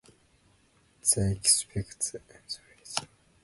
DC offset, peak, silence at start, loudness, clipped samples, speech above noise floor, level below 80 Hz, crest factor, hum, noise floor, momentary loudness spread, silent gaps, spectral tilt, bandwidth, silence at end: under 0.1%; -8 dBFS; 1.05 s; -27 LUFS; under 0.1%; 36 dB; -52 dBFS; 24 dB; none; -65 dBFS; 17 LU; none; -2.5 dB/octave; 12 kHz; 0.4 s